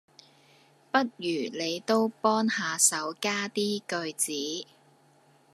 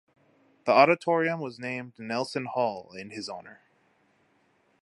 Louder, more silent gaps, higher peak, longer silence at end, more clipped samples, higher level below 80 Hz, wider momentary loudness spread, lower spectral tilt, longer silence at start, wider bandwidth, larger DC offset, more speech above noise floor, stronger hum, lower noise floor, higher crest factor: about the same, -28 LUFS vs -27 LUFS; neither; second, -8 dBFS vs -4 dBFS; second, 0.9 s vs 1.3 s; neither; second, -86 dBFS vs -78 dBFS; second, 10 LU vs 18 LU; second, -2 dB/octave vs -5.5 dB/octave; first, 0.95 s vs 0.65 s; first, 14 kHz vs 11.5 kHz; neither; second, 33 dB vs 40 dB; neither; second, -62 dBFS vs -68 dBFS; about the same, 22 dB vs 24 dB